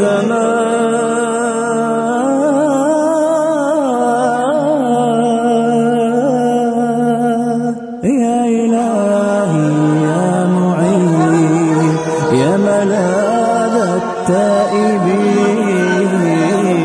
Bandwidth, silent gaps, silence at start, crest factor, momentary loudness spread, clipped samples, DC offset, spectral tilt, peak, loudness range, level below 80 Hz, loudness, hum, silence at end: 11 kHz; none; 0 s; 12 dB; 3 LU; under 0.1%; under 0.1%; -6.5 dB/octave; -2 dBFS; 1 LU; -56 dBFS; -13 LUFS; none; 0 s